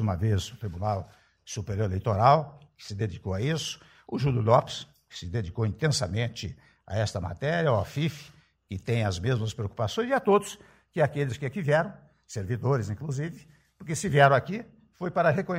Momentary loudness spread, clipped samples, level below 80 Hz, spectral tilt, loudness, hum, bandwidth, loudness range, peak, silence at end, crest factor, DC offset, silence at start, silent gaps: 16 LU; under 0.1%; -54 dBFS; -6 dB/octave; -28 LUFS; none; 15.5 kHz; 3 LU; -6 dBFS; 0 s; 22 dB; under 0.1%; 0 s; none